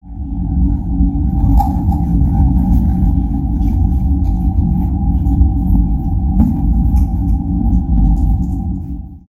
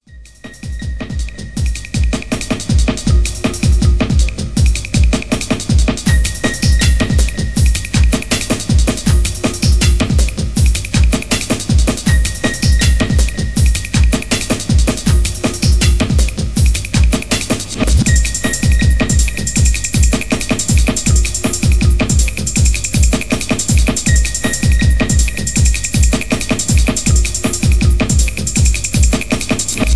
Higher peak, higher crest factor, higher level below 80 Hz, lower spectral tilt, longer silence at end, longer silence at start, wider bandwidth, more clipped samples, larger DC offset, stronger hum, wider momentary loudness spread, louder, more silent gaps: about the same, 0 dBFS vs 0 dBFS; about the same, 12 dB vs 12 dB; about the same, -16 dBFS vs -16 dBFS; first, -11.5 dB/octave vs -4.5 dB/octave; about the same, 0.1 s vs 0 s; about the same, 0.05 s vs 0 s; second, 1.6 kHz vs 11 kHz; neither; second, under 0.1% vs 3%; neither; about the same, 4 LU vs 4 LU; about the same, -15 LUFS vs -14 LUFS; neither